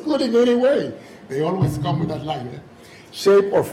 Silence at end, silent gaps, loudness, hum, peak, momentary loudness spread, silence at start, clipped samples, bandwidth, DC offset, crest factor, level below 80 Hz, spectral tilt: 0 s; none; -19 LUFS; none; -6 dBFS; 19 LU; 0 s; under 0.1%; 15.5 kHz; under 0.1%; 12 dB; -50 dBFS; -6.5 dB/octave